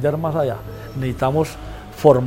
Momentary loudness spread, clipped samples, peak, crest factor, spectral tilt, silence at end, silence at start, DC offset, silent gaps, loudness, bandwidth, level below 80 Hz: 15 LU; under 0.1%; 0 dBFS; 18 dB; -7.5 dB/octave; 0 s; 0 s; under 0.1%; none; -21 LUFS; 16.5 kHz; -40 dBFS